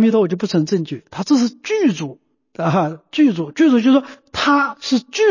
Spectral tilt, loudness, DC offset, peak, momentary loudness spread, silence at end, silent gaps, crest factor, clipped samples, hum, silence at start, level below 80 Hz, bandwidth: -5.5 dB/octave; -17 LUFS; under 0.1%; -4 dBFS; 10 LU; 0 s; none; 12 dB; under 0.1%; none; 0 s; -56 dBFS; 7.4 kHz